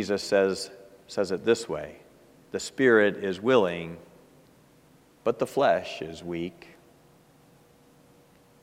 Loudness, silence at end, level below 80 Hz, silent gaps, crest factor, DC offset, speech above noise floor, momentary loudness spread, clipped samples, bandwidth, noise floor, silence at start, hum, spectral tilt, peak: -26 LUFS; 2.1 s; -66 dBFS; none; 20 dB; under 0.1%; 32 dB; 16 LU; under 0.1%; 15.5 kHz; -58 dBFS; 0 s; none; -4.5 dB/octave; -8 dBFS